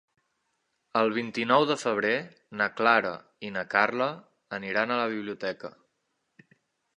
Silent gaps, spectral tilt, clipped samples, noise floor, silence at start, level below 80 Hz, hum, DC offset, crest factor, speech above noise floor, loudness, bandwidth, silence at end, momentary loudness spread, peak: none; -4.5 dB/octave; under 0.1%; -78 dBFS; 0.95 s; -76 dBFS; none; under 0.1%; 24 dB; 50 dB; -27 LUFS; 11 kHz; 1.25 s; 16 LU; -6 dBFS